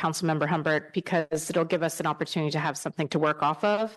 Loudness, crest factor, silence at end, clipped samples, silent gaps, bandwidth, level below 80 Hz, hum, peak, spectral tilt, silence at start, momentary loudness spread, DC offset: -27 LUFS; 16 dB; 0 s; under 0.1%; none; 12.5 kHz; -70 dBFS; none; -12 dBFS; -5 dB/octave; 0 s; 4 LU; under 0.1%